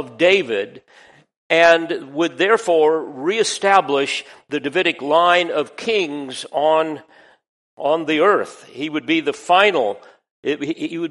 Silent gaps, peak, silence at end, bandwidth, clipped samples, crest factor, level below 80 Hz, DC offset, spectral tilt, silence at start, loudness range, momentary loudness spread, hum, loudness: 1.36-1.50 s, 7.49-7.77 s, 10.31-10.43 s; 0 dBFS; 0 s; 11.5 kHz; under 0.1%; 18 dB; -66 dBFS; under 0.1%; -3.5 dB/octave; 0 s; 3 LU; 12 LU; none; -18 LUFS